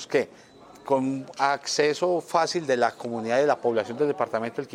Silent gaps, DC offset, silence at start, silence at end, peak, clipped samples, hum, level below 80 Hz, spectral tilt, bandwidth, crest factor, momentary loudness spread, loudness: none; under 0.1%; 0 s; 0 s; -6 dBFS; under 0.1%; none; -74 dBFS; -4 dB/octave; 15 kHz; 20 dB; 7 LU; -25 LUFS